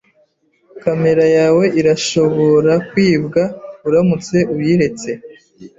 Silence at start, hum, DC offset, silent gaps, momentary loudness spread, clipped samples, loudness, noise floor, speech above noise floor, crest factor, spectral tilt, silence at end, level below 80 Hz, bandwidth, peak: 0.75 s; none; under 0.1%; none; 11 LU; under 0.1%; -14 LUFS; -58 dBFS; 44 dB; 12 dB; -6 dB/octave; 0.1 s; -50 dBFS; 7.8 kHz; -2 dBFS